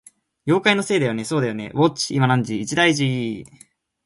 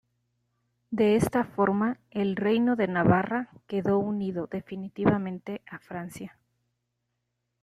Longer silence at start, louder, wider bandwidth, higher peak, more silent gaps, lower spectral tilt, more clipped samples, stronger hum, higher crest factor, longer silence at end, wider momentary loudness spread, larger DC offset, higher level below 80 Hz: second, 0.45 s vs 0.9 s; first, -20 LUFS vs -27 LUFS; second, 11.5 kHz vs 13.5 kHz; first, -2 dBFS vs -8 dBFS; neither; second, -5 dB/octave vs -7.5 dB/octave; neither; second, none vs 60 Hz at -55 dBFS; about the same, 20 dB vs 20 dB; second, 0.6 s vs 1.35 s; second, 8 LU vs 15 LU; neither; about the same, -58 dBFS vs -60 dBFS